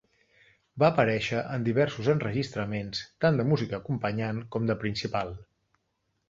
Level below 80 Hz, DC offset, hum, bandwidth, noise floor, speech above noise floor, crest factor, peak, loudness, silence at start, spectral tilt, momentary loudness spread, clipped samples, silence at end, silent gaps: -58 dBFS; under 0.1%; none; 7.8 kHz; -77 dBFS; 49 dB; 22 dB; -8 dBFS; -28 LUFS; 0.75 s; -7 dB/octave; 9 LU; under 0.1%; 0.85 s; none